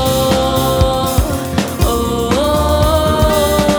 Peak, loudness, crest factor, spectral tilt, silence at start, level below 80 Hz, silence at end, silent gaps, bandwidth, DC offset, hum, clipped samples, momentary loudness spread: -2 dBFS; -14 LUFS; 12 dB; -5 dB/octave; 0 s; -22 dBFS; 0 s; none; over 20 kHz; under 0.1%; none; under 0.1%; 4 LU